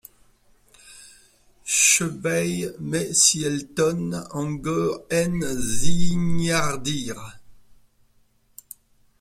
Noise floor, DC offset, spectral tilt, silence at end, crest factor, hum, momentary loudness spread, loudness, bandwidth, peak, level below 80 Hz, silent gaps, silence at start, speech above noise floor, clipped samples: -61 dBFS; under 0.1%; -3 dB/octave; 1.65 s; 18 dB; none; 13 LU; -22 LUFS; 16 kHz; -4 dBFS; -46 dBFS; none; 1.65 s; 40 dB; under 0.1%